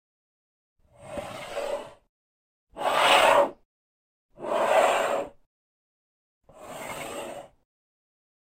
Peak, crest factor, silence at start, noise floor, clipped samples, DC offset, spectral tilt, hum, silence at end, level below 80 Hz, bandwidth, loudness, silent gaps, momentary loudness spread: -8 dBFS; 22 dB; 1 s; under -90 dBFS; under 0.1%; under 0.1%; -2 dB/octave; none; 1.05 s; -62 dBFS; 16 kHz; -24 LUFS; 2.09-2.67 s, 3.65-4.29 s, 5.46-6.41 s; 21 LU